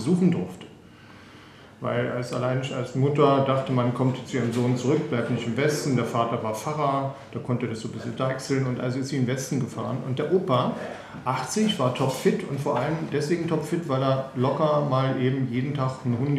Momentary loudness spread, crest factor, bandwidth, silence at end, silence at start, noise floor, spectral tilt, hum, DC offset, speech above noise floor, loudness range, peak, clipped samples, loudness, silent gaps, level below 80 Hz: 7 LU; 20 dB; 14.5 kHz; 0 s; 0 s; -48 dBFS; -6.5 dB/octave; none; under 0.1%; 23 dB; 3 LU; -6 dBFS; under 0.1%; -25 LUFS; none; -62 dBFS